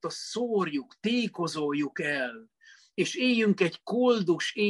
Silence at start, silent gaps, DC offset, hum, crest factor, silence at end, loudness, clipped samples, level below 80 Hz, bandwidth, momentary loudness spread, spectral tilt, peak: 0.05 s; none; under 0.1%; none; 18 dB; 0 s; -28 LUFS; under 0.1%; -76 dBFS; 12 kHz; 8 LU; -4.5 dB/octave; -12 dBFS